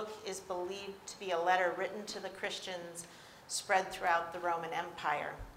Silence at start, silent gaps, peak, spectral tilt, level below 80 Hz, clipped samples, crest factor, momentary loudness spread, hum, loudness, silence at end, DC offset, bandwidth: 0 s; none; -16 dBFS; -2.5 dB/octave; -64 dBFS; under 0.1%; 22 dB; 12 LU; none; -36 LUFS; 0 s; under 0.1%; 16 kHz